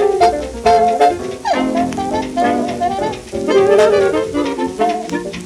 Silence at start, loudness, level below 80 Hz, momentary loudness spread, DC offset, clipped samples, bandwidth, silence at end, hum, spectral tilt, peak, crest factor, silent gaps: 0 s; -15 LUFS; -40 dBFS; 10 LU; under 0.1%; under 0.1%; 13 kHz; 0 s; none; -5 dB/octave; 0 dBFS; 14 dB; none